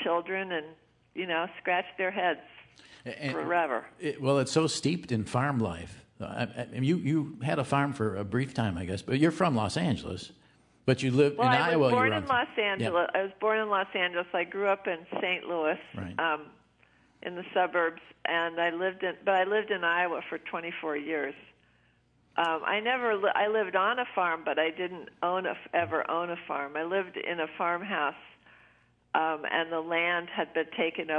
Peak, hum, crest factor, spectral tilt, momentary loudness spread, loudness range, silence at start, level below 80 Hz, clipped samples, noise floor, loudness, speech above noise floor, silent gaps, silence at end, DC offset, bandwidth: -8 dBFS; none; 22 dB; -5.5 dB/octave; 10 LU; 5 LU; 0 s; -68 dBFS; under 0.1%; -67 dBFS; -29 LUFS; 37 dB; none; 0 s; under 0.1%; 11 kHz